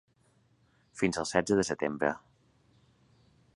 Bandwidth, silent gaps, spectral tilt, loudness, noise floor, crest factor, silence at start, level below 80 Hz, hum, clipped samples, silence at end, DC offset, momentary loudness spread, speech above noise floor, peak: 11 kHz; none; -4.5 dB/octave; -30 LUFS; -68 dBFS; 26 dB; 0.95 s; -62 dBFS; none; under 0.1%; 1.4 s; under 0.1%; 11 LU; 38 dB; -8 dBFS